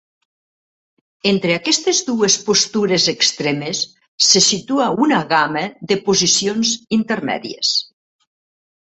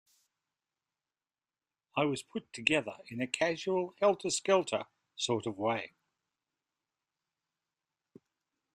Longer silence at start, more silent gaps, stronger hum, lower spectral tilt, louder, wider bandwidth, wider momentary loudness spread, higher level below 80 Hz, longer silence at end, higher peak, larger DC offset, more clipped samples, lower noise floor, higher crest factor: second, 1.25 s vs 1.95 s; first, 4.08-4.18 s vs none; neither; about the same, -2.5 dB/octave vs -3.5 dB/octave; first, -16 LUFS vs -33 LUFS; second, 8.4 kHz vs 12.5 kHz; about the same, 8 LU vs 10 LU; first, -60 dBFS vs -78 dBFS; second, 1.05 s vs 2.9 s; first, 0 dBFS vs -10 dBFS; neither; neither; about the same, under -90 dBFS vs under -90 dBFS; second, 18 dB vs 26 dB